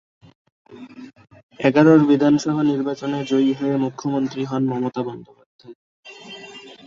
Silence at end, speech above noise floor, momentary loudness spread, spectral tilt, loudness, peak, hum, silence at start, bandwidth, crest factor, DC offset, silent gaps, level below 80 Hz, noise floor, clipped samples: 0.15 s; 22 dB; 25 LU; -7 dB/octave; -19 LUFS; -2 dBFS; none; 0.7 s; 7.6 kHz; 20 dB; under 0.1%; 1.43-1.49 s, 5.46-5.59 s, 5.75-6.03 s; -62 dBFS; -40 dBFS; under 0.1%